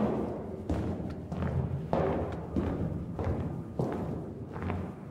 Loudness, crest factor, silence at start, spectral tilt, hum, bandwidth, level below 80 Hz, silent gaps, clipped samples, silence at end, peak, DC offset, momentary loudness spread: -34 LUFS; 22 dB; 0 s; -9.5 dB/octave; none; 10.5 kHz; -46 dBFS; none; under 0.1%; 0 s; -12 dBFS; under 0.1%; 7 LU